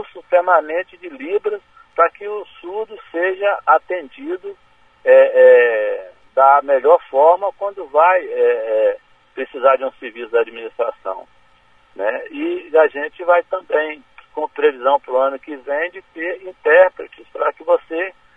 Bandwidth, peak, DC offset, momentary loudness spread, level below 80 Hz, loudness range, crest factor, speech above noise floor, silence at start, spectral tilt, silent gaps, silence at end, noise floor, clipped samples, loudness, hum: 3.7 kHz; 0 dBFS; 0.2%; 17 LU; -64 dBFS; 8 LU; 16 dB; 37 dB; 0 s; -4.5 dB/octave; none; 0.25 s; -54 dBFS; under 0.1%; -16 LUFS; none